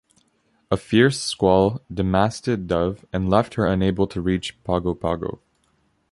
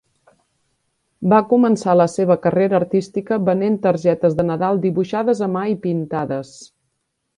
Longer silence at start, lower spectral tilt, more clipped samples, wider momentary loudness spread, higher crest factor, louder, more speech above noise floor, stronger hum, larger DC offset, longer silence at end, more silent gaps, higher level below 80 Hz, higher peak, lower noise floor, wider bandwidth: second, 0.7 s vs 1.2 s; second, -6 dB/octave vs -7.5 dB/octave; neither; about the same, 9 LU vs 8 LU; about the same, 20 dB vs 18 dB; second, -22 LUFS vs -18 LUFS; second, 44 dB vs 56 dB; neither; neither; about the same, 0.75 s vs 0.75 s; neither; first, -42 dBFS vs -58 dBFS; about the same, -2 dBFS vs -2 dBFS; second, -65 dBFS vs -73 dBFS; about the same, 11.5 kHz vs 10.5 kHz